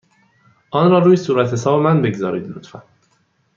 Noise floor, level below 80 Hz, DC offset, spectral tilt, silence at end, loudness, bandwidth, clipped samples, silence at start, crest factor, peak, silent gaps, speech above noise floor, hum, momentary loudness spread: -62 dBFS; -60 dBFS; under 0.1%; -7.5 dB/octave; 0.75 s; -16 LUFS; 7.4 kHz; under 0.1%; 0.75 s; 16 dB; -2 dBFS; none; 46 dB; none; 14 LU